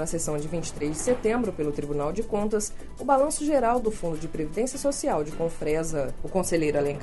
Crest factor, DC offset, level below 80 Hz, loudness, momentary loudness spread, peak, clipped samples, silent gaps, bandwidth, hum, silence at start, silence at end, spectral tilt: 18 dB; under 0.1%; -40 dBFS; -27 LUFS; 8 LU; -8 dBFS; under 0.1%; none; 11.5 kHz; none; 0 s; 0 s; -5 dB/octave